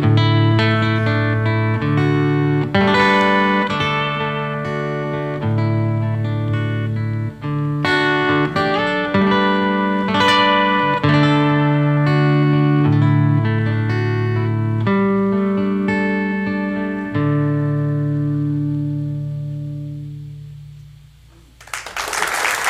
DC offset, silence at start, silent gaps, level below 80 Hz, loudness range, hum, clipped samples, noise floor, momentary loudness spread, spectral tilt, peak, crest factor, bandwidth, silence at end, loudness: under 0.1%; 0 s; none; -48 dBFS; 8 LU; none; under 0.1%; -46 dBFS; 9 LU; -6.5 dB/octave; -2 dBFS; 14 dB; 14.5 kHz; 0 s; -17 LUFS